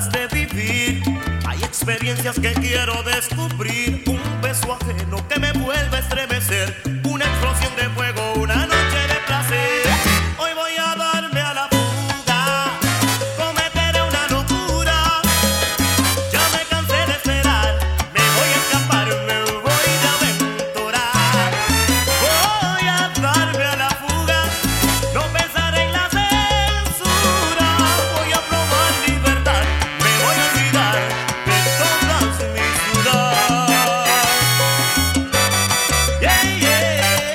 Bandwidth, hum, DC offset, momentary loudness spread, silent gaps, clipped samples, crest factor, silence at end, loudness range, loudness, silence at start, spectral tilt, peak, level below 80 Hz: 17.5 kHz; none; under 0.1%; 6 LU; none; under 0.1%; 18 dB; 0 s; 5 LU; -17 LUFS; 0 s; -3 dB/octave; 0 dBFS; -28 dBFS